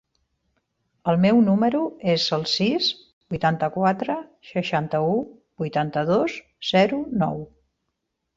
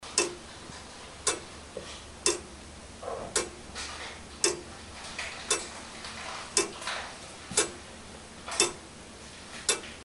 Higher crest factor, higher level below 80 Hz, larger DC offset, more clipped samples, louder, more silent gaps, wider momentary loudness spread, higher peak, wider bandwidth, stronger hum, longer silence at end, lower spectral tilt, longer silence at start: second, 18 dB vs 28 dB; about the same, -58 dBFS vs -54 dBFS; neither; neither; first, -22 LUFS vs -32 LUFS; first, 3.13-3.21 s vs none; second, 12 LU vs 16 LU; about the same, -6 dBFS vs -6 dBFS; second, 7.8 kHz vs 11.5 kHz; neither; first, 0.9 s vs 0 s; first, -6 dB/octave vs -1 dB/octave; first, 1.05 s vs 0 s